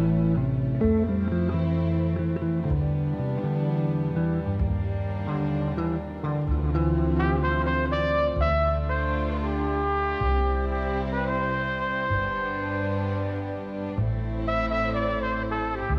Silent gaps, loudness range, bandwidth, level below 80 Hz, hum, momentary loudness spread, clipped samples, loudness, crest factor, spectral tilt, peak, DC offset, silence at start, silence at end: none; 3 LU; 6 kHz; -32 dBFS; none; 5 LU; under 0.1%; -26 LUFS; 14 dB; -9.5 dB/octave; -12 dBFS; under 0.1%; 0 s; 0 s